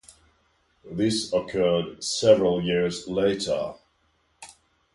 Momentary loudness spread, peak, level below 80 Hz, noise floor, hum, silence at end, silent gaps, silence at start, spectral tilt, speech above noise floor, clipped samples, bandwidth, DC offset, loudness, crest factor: 9 LU; -6 dBFS; -56 dBFS; -68 dBFS; none; 0.45 s; none; 0.85 s; -4.5 dB/octave; 44 dB; under 0.1%; 11.5 kHz; under 0.1%; -24 LUFS; 20 dB